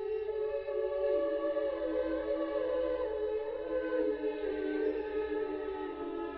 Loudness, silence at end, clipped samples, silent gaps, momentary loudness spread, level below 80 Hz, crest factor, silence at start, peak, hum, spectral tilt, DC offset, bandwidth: -35 LUFS; 0 s; under 0.1%; none; 5 LU; -58 dBFS; 14 dB; 0 s; -20 dBFS; none; -4 dB/octave; under 0.1%; 5 kHz